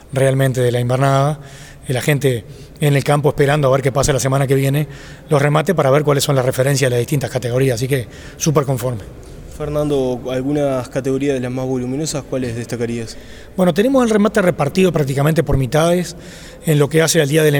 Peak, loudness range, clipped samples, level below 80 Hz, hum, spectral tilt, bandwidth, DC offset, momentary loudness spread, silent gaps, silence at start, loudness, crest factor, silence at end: -2 dBFS; 4 LU; under 0.1%; -38 dBFS; none; -5.5 dB/octave; over 20 kHz; under 0.1%; 13 LU; none; 0.1 s; -16 LUFS; 14 dB; 0 s